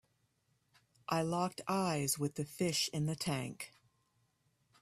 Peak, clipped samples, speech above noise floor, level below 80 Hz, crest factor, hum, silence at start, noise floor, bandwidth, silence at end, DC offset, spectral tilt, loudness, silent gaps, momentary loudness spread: -20 dBFS; under 0.1%; 41 dB; -72 dBFS; 20 dB; none; 1.1 s; -78 dBFS; 15.5 kHz; 1.15 s; under 0.1%; -4.5 dB/octave; -36 LUFS; none; 11 LU